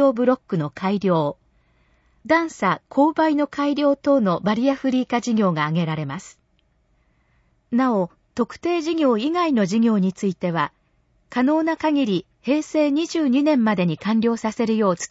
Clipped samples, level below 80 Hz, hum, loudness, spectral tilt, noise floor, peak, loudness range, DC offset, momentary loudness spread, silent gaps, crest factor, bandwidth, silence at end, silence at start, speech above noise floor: under 0.1%; -62 dBFS; none; -21 LUFS; -6.5 dB/octave; -64 dBFS; -6 dBFS; 4 LU; under 0.1%; 7 LU; none; 16 dB; 8 kHz; 0.05 s; 0 s; 44 dB